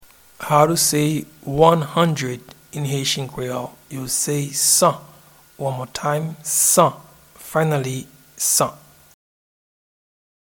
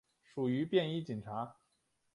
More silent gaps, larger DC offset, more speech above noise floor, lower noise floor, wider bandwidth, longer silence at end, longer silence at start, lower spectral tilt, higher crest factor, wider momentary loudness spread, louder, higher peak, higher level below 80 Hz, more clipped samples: neither; neither; second, 30 dB vs 44 dB; second, -49 dBFS vs -79 dBFS; first, 19 kHz vs 11 kHz; first, 1.7 s vs 0.65 s; about the same, 0.4 s vs 0.35 s; second, -3.5 dB/octave vs -8 dB/octave; about the same, 22 dB vs 20 dB; about the same, 15 LU vs 13 LU; first, -19 LUFS vs -37 LUFS; first, 0 dBFS vs -18 dBFS; first, -54 dBFS vs -74 dBFS; neither